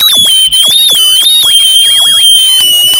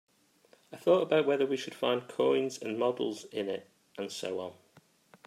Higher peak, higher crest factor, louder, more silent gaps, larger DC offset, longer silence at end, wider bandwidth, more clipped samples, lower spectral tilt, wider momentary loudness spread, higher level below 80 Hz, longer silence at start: first, 0 dBFS vs -14 dBFS; second, 6 dB vs 18 dB; first, -2 LUFS vs -31 LUFS; neither; neither; second, 0 s vs 0.75 s; first, over 20 kHz vs 14.5 kHz; first, 0.5% vs under 0.1%; second, 2.5 dB/octave vs -4.5 dB/octave; second, 1 LU vs 14 LU; first, -46 dBFS vs -84 dBFS; second, 0 s vs 0.7 s